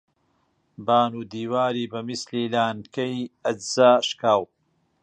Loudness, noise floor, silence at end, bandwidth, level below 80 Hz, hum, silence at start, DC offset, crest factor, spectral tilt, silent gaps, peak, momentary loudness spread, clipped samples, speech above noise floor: -23 LUFS; -68 dBFS; 0.6 s; 9.8 kHz; -68 dBFS; none; 0.8 s; under 0.1%; 20 dB; -4.5 dB/octave; none; -4 dBFS; 12 LU; under 0.1%; 46 dB